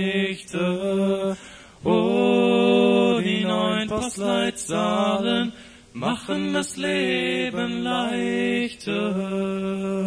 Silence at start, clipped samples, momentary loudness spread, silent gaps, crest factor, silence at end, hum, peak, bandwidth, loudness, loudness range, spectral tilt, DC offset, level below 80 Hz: 0 s; under 0.1%; 8 LU; none; 16 dB; 0 s; none; -8 dBFS; 11 kHz; -23 LUFS; 4 LU; -5 dB/octave; under 0.1%; -56 dBFS